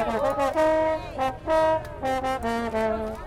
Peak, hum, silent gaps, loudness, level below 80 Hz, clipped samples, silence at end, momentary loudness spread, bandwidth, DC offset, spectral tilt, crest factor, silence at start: -10 dBFS; none; none; -25 LUFS; -44 dBFS; under 0.1%; 0 s; 6 LU; 15.5 kHz; under 0.1%; -5.5 dB/octave; 14 dB; 0 s